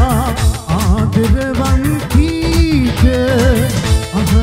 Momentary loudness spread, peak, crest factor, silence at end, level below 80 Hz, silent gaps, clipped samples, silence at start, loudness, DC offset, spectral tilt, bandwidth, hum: 3 LU; 0 dBFS; 12 dB; 0 s; -18 dBFS; none; under 0.1%; 0 s; -14 LUFS; under 0.1%; -6 dB/octave; 16 kHz; none